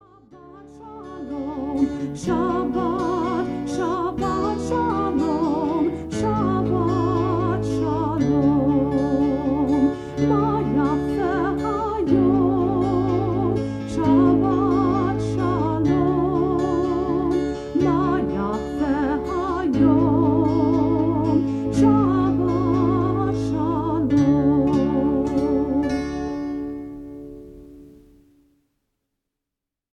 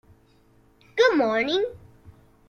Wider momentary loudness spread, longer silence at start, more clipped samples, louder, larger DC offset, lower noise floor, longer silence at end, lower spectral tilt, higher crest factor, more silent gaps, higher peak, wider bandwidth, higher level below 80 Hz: second, 8 LU vs 12 LU; second, 0.35 s vs 0.95 s; neither; about the same, -21 LUFS vs -23 LUFS; neither; first, -85 dBFS vs -58 dBFS; first, 2.05 s vs 0.4 s; first, -8.5 dB/octave vs -4 dB/octave; about the same, 16 dB vs 18 dB; neither; about the same, -6 dBFS vs -8 dBFS; second, 9.4 kHz vs 10.5 kHz; first, -40 dBFS vs -60 dBFS